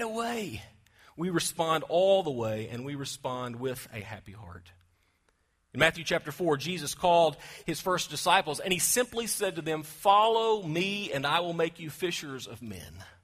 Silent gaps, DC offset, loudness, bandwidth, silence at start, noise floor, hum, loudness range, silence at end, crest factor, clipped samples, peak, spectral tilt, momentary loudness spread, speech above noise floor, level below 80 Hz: none; under 0.1%; -28 LUFS; 15.5 kHz; 0 s; -72 dBFS; none; 7 LU; 0.15 s; 24 dB; under 0.1%; -6 dBFS; -3.5 dB/octave; 17 LU; 42 dB; -62 dBFS